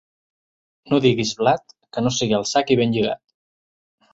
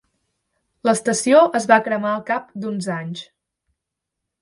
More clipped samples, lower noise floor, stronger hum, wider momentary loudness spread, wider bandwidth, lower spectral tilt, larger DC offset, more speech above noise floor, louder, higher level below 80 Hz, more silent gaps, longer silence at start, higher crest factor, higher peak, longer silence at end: neither; first, under -90 dBFS vs -82 dBFS; neither; second, 7 LU vs 14 LU; second, 8 kHz vs 11.5 kHz; about the same, -5 dB/octave vs -4.5 dB/octave; neither; first, over 71 dB vs 63 dB; about the same, -20 LUFS vs -19 LUFS; first, -56 dBFS vs -68 dBFS; neither; about the same, 0.85 s vs 0.85 s; about the same, 20 dB vs 20 dB; about the same, -2 dBFS vs 0 dBFS; second, 0.95 s vs 1.2 s